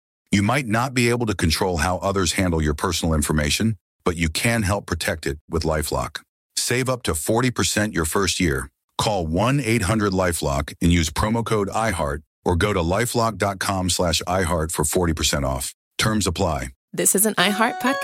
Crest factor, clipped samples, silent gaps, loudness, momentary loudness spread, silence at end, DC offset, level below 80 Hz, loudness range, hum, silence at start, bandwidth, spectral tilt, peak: 18 dB; under 0.1%; 3.81-3.99 s, 5.41-5.48 s, 6.29-6.50 s, 8.84-8.89 s, 12.26-12.43 s, 15.74-15.91 s, 16.76-16.88 s; -21 LUFS; 6 LU; 0 s; under 0.1%; -36 dBFS; 2 LU; none; 0.3 s; 16.5 kHz; -4 dB/octave; -2 dBFS